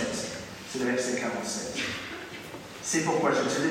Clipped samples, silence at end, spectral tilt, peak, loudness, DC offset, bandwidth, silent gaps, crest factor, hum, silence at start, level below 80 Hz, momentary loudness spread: under 0.1%; 0 s; -3.5 dB/octave; -14 dBFS; -30 LUFS; under 0.1%; 16 kHz; none; 16 dB; none; 0 s; -62 dBFS; 13 LU